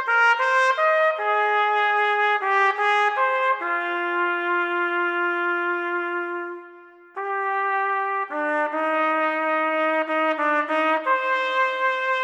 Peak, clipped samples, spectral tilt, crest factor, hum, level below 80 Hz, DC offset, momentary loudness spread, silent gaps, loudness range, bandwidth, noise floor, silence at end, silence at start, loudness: -8 dBFS; under 0.1%; -1 dB/octave; 16 dB; none; -88 dBFS; under 0.1%; 7 LU; none; 5 LU; 10 kHz; -46 dBFS; 0 s; 0 s; -21 LUFS